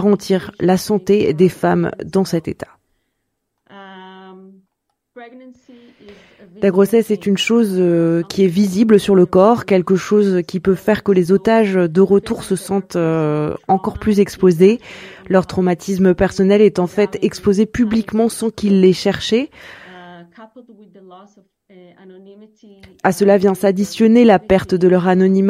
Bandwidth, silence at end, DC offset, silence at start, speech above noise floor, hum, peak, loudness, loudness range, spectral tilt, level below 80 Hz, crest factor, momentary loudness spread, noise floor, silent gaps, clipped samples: 15 kHz; 0 s; under 0.1%; 0 s; 58 dB; none; 0 dBFS; -15 LUFS; 9 LU; -6.5 dB/octave; -46 dBFS; 16 dB; 8 LU; -73 dBFS; none; under 0.1%